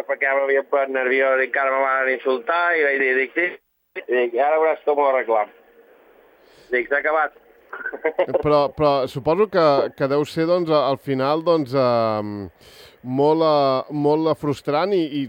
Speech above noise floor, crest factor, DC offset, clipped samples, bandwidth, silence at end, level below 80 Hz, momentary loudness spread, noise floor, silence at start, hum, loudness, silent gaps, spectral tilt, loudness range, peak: 33 dB; 16 dB; under 0.1%; under 0.1%; 16.5 kHz; 0 s; -58 dBFS; 8 LU; -52 dBFS; 0 s; none; -20 LUFS; none; -7 dB/octave; 3 LU; -6 dBFS